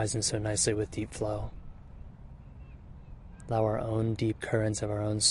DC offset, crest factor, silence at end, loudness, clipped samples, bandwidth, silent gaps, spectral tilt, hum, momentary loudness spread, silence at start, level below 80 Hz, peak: under 0.1%; 20 dB; 0 s; -31 LUFS; under 0.1%; 11.5 kHz; none; -4 dB/octave; none; 22 LU; 0 s; -48 dBFS; -12 dBFS